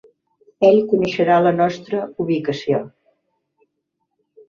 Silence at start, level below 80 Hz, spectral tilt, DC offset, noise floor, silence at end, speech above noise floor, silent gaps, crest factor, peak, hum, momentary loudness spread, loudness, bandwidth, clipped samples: 0.6 s; -62 dBFS; -7 dB/octave; under 0.1%; -75 dBFS; 1.6 s; 58 dB; none; 18 dB; -2 dBFS; none; 10 LU; -18 LUFS; 7.2 kHz; under 0.1%